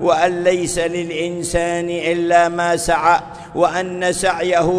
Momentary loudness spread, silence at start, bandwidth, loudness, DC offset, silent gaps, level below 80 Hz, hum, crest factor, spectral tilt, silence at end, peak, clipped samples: 6 LU; 0 s; 11 kHz; -17 LUFS; under 0.1%; none; -40 dBFS; none; 16 dB; -4 dB/octave; 0 s; 0 dBFS; under 0.1%